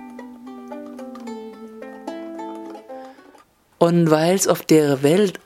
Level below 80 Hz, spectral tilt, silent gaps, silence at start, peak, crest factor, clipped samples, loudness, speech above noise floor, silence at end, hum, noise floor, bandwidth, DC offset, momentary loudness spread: -68 dBFS; -5.5 dB/octave; none; 0 s; 0 dBFS; 20 dB; under 0.1%; -17 LUFS; 37 dB; 0.1 s; none; -53 dBFS; 16.5 kHz; under 0.1%; 22 LU